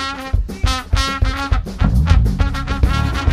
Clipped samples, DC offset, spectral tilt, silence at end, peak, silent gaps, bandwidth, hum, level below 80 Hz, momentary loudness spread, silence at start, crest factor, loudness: under 0.1%; under 0.1%; -5.5 dB/octave; 0 s; 0 dBFS; none; 13.5 kHz; none; -18 dBFS; 6 LU; 0 s; 16 dB; -18 LUFS